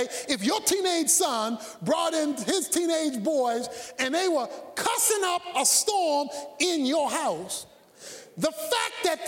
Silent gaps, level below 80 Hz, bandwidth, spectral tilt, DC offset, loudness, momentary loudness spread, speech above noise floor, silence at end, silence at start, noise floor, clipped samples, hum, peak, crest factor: none; -70 dBFS; 17 kHz; -1.5 dB/octave; under 0.1%; -25 LUFS; 12 LU; 20 dB; 0 s; 0 s; -46 dBFS; under 0.1%; none; -10 dBFS; 16 dB